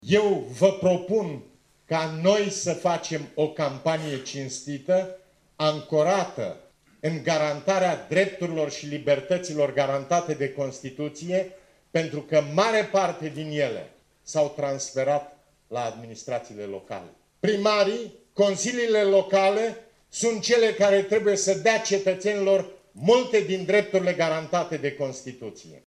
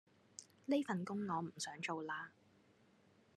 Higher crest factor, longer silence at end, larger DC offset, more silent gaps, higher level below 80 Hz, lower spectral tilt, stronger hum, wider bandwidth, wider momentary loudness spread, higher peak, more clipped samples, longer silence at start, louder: about the same, 18 dB vs 20 dB; second, 0.1 s vs 1.05 s; neither; neither; first, -68 dBFS vs -90 dBFS; about the same, -4.5 dB/octave vs -4.5 dB/octave; neither; second, 11 kHz vs 12.5 kHz; second, 13 LU vs 18 LU; first, -6 dBFS vs -26 dBFS; neither; second, 0.05 s vs 0.4 s; first, -25 LUFS vs -42 LUFS